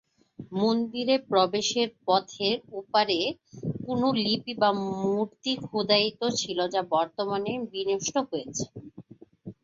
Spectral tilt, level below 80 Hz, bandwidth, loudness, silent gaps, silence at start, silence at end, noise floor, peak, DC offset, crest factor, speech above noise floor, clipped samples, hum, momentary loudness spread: -4 dB/octave; -66 dBFS; 7.8 kHz; -27 LUFS; none; 0.4 s; 0.1 s; -49 dBFS; -8 dBFS; under 0.1%; 20 dB; 22 dB; under 0.1%; none; 11 LU